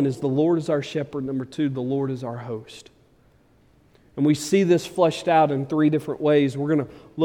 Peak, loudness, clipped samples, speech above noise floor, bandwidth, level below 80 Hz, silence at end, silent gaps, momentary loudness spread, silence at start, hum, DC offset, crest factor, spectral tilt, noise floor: -6 dBFS; -22 LUFS; under 0.1%; 36 dB; 16 kHz; -62 dBFS; 0 s; none; 13 LU; 0 s; none; under 0.1%; 16 dB; -6.5 dB/octave; -58 dBFS